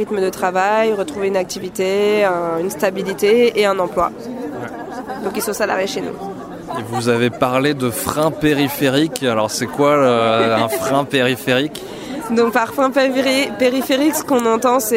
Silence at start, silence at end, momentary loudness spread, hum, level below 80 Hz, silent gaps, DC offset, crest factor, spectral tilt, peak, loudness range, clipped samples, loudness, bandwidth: 0 s; 0 s; 12 LU; none; -50 dBFS; none; under 0.1%; 16 dB; -4.5 dB/octave; 0 dBFS; 4 LU; under 0.1%; -17 LUFS; 16.5 kHz